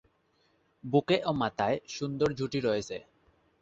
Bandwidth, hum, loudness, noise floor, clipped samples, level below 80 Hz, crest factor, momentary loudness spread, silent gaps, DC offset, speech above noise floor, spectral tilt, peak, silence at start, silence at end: 8 kHz; none; -30 LUFS; -70 dBFS; under 0.1%; -62 dBFS; 20 dB; 12 LU; none; under 0.1%; 41 dB; -6 dB/octave; -12 dBFS; 0.85 s; 0.6 s